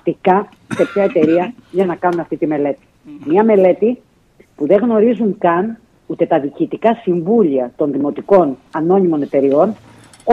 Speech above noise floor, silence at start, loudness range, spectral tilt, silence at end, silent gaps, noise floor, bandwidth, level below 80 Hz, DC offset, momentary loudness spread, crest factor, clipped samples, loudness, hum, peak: 36 dB; 0.05 s; 2 LU; -8.5 dB/octave; 0 s; none; -50 dBFS; 10 kHz; -58 dBFS; under 0.1%; 10 LU; 14 dB; under 0.1%; -15 LUFS; none; 0 dBFS